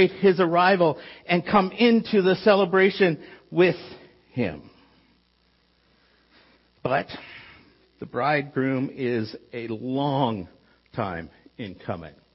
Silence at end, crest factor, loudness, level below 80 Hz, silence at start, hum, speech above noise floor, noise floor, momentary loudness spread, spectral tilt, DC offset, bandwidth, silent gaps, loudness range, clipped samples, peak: 0.25 s; 18 dB; -23 LUFS; -60 dBFS; 0 s; none; 42 dB; -65 dBFS; 19 LU; -10 dB/octave; under 0.1%; 5.8 kHz; none; 14 LU; under 0.1%; -6 dBFS